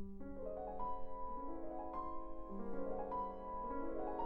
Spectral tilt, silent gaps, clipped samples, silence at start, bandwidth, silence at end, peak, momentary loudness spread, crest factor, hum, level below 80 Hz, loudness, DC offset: -10 dB/octave; none; under 0.1%; 0 s; 3.2 kHz; 0 s; -30 dBFS; 6 LU; 12 dB; none; -54 dBFS; -46 LUFS; under 0.1%